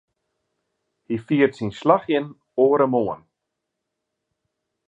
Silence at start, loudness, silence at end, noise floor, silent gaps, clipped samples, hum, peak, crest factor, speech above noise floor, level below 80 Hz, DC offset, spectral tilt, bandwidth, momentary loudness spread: 1.1 s; -21 LUFS; 1.7 s; -81 dBFS; none; under 0.1%; none; -2 dBFS; 22 dB; 61 dB; -64 dBFS; under 0.1%; -8 dB/octave; 8 kHz; 12 LU